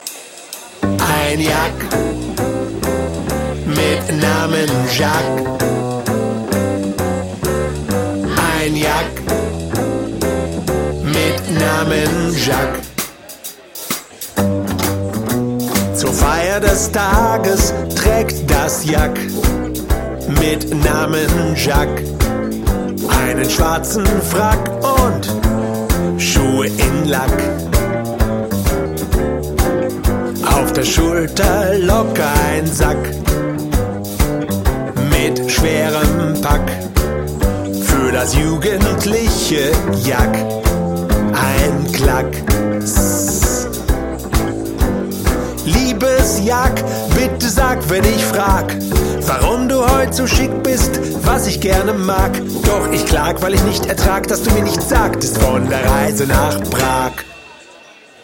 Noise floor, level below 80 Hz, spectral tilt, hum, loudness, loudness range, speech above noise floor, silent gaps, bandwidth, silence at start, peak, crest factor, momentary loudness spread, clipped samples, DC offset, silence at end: -41 dBFS; -22 dBFS; -4.5 dB/octave; none; -16 LUFS; 3 LU; 27 dB; none; 17 kHz; 0 s; 0 dBFS; 16 dB; 6 LU; under 0.1%; under 0.1%; 0.6 s